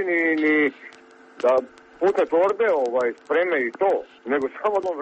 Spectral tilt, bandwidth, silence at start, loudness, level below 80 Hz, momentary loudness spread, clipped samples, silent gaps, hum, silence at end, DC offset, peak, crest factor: -5.5 dB/octave; 8.4 kHz; 0 s; -22 LUFS; -68 dBFS; 5 LU; under 0.1%; none; none; 0 s; under 0.1%; -8 dBFS; 14 dB